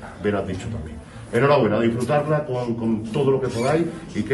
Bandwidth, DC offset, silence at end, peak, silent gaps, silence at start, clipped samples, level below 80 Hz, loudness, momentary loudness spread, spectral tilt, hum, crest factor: 12 kHz; under 0.1%; 0 s; -6 dBFS; none; 0 s; under 0.1%; -46 dBFS; -22 LUFS; 12 LU; -7 dB/octave; none; 16 dB